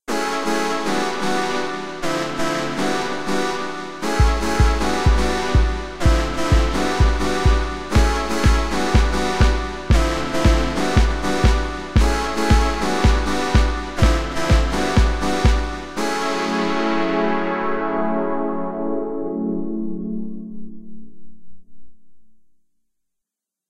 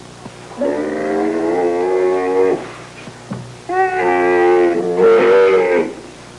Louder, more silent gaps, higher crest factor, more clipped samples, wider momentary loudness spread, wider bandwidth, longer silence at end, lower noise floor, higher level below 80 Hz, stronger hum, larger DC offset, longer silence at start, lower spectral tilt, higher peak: second, -20 LUFS vs -15 LUFS; neither; first, 18 dB vs 12 dB; neither; second, 7 LU vs 21 LU; first, 13.5 kHz vs 11 kHz; about the same, 0 s vs 0 s; first, -84 dBFS vs -35 dBFS; first, -22 dBFS vs -56 dBFS; neither; first, 3% vs 0.2%; about the same, 0 s vs 0 s; about the same, -5.5 dB/octave vs -6 dB/octave; about the same, 0 dBFS vs -2 dBFS